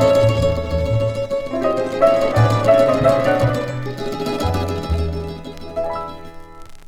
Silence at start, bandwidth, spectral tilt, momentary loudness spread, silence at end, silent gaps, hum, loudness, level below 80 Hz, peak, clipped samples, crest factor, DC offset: 0 s; 15.5 kHz; -7 dB/octave; 14 LU; 0 s; none; none; -18 LUFS; -32 dBFS; 0 dBFS; under 0.1%; 16 dB; under 0.1%